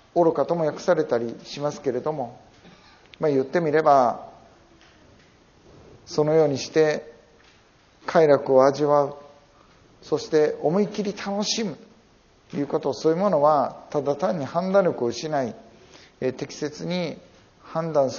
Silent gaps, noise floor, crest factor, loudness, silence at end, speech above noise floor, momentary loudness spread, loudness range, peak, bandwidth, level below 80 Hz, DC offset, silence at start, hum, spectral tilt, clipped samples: none; -57 dBFS; 20 dB; -23 LUFS; 0 s; 34 dB; 13 LU; 4 LU; -4 dBFS; 7.2 kHz; -64 dBFS; under 0.1%; 0.15 s; none; -5 dB/octave; under 0.1%